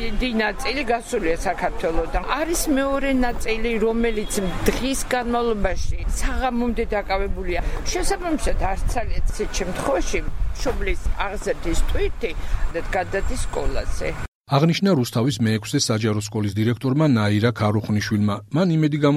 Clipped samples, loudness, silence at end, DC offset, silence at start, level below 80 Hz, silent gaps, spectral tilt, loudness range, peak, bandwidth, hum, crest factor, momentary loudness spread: under 0.1%; -23 LUFS; 0 s; under 0.1%; 0 s; -28 dBFS; 14.28-14.41 s; -5.5 dB/octave; 5 LU; -4 dBFS; 16 kHz; none; 16 dB; 8 LU